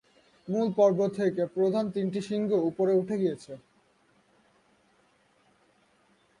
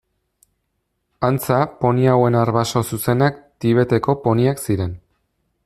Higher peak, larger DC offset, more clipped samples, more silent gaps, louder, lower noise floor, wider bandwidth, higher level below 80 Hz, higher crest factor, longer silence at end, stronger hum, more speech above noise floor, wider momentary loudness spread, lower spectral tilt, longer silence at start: second, -12 dBFS vs -2 dBFS; neither; neither; neither; second, -27 LUFS vs -18 LUFS; second, -66 dBFS vs -72 dBFS; second, 11 kHz vs 15 kHz; second, -74 dBFS vs -50 dBFS; about the same, 18 dB vs 16 dB; first, 2.8 s vs 0.7 s; neither; second, 39 dB vs 55 dB; first, 14 LU vs 8 LU; about the same, -7.5 dB/octave vs -6.5 dB/octave; second, 0.45 s vs 1.2 s